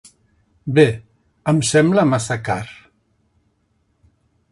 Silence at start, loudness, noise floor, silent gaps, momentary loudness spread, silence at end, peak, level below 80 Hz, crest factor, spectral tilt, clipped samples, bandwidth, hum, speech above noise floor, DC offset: 0.65 s; -17 LUFS; -65 dBFS; none; 17 LU; 1.8 s; 0 dBFS; -52 dBFS; 20 dB; -5.5 dB/octave; under 0.1%; 11.5 kHz; none; 49 dB; under 0.1%